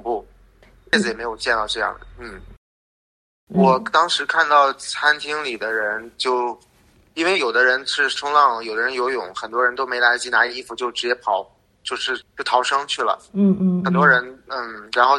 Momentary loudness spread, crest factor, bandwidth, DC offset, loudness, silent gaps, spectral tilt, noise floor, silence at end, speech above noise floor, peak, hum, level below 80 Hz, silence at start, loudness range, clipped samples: 12 LU; 20 dB; 11 kHz; under 0.1%; -19 LUFS; 2.57-3.47 s; -4 dB/octave; -51 dBFS; 0 s; 31 dB; -2 dBFS; none; -54 dBFS; 0.05 s; 3 LU; under 0.1%